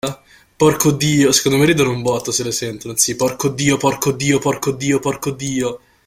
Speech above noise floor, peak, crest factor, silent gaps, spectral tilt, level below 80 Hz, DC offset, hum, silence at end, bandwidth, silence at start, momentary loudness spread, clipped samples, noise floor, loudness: 21 dB; 0 dBFS; 18 dB; none; -4 dB/octave; -48 dBFS; under 0.1%; none; 0.3 s; 16.5 kHz; 0.05 s; 9 LU; under 0.1%; -37 dBFS; -17 LUFS